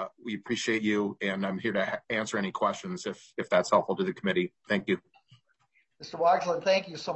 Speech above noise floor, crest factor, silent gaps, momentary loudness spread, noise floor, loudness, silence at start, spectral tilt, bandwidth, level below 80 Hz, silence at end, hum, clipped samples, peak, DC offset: 42 dB; 20 dB; none; 11 LU; -71 dBFS; -29 LUFS; 0 s; -4.5 dB/octave; 8.4 kHz; -74 dBFS; 0 s; none; under 0.1%; -10 dBFS; under 0.1%